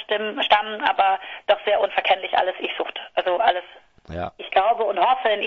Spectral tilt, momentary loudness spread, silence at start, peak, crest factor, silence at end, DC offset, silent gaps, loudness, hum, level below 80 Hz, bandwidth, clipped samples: -5 dB/octave; 10 LU; 0 s; -2 dBFS; 20 dB; 0 s; under 0.1%; none; -21 LUFS; none; -56 dBFS; 6.4 kHz; under 0.1%